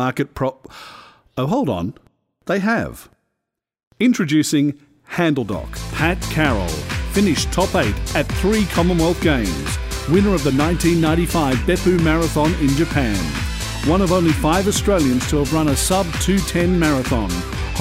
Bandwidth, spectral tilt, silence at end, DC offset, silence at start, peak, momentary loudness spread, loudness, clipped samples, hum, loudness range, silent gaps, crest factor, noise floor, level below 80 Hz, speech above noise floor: 16 kHz; -5 dB/octave; 0 s; under 0.1%; 0 s; -2 dBFS; 8 LU; -18 LUFS; under 0.1%; none; 4 LU; 3.87-3.91 s; 16 dB; -80 dBFS; -28 dBFS; 63 dB